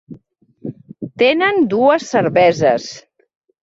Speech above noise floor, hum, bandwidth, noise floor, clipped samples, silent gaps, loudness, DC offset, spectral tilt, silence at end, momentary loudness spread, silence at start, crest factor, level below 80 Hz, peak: 36 dB; none; 7.8 kHz; -50 dBFS; under 0.1%; none; -14 LUFS; under 0.1%; -5 dB/octave; 0.65 s; 19 LU; 0.1 s; 14 dB; -58 dBFS; -2 dBFS